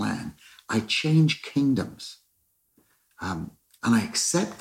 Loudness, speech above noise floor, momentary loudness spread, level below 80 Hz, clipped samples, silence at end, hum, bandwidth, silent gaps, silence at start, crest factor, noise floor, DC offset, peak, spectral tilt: -25 LUFS; 46 dB; 18 LU; -60 dBFS; under 0.1%; 0 s; none; 15.5 kHz; none; 0 s; 16 dB; -70 dBFS; under 0.1%; -10 dBFS; -4.5 dB/octave